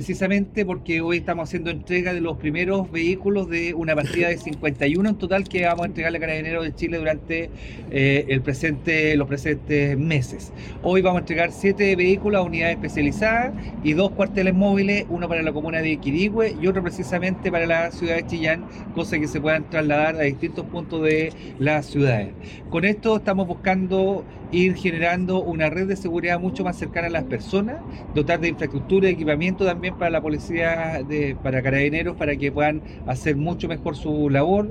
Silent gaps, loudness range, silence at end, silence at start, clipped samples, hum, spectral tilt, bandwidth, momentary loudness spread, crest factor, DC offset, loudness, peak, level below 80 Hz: none; 3 LU; 0 s; 0 s; under 0.1%; none; -7 dB/octave; 11 kHz; 7 LU; 16 dB; under 0.1%; -22 LUFS; -6 dBFS; -42 dBFS